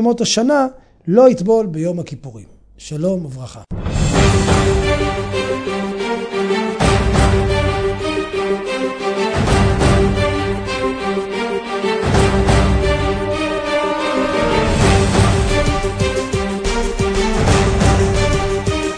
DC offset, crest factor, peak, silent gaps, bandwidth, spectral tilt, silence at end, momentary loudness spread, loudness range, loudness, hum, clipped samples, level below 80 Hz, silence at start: under 0.1%; 16 dB; 0 dBFS; none; 10.5 kHz; -5.5 dB/octave; 0 s; 8 LU; 2 LU; -16 LUFS; none; under 0.1%; -24 dBFS; 0 s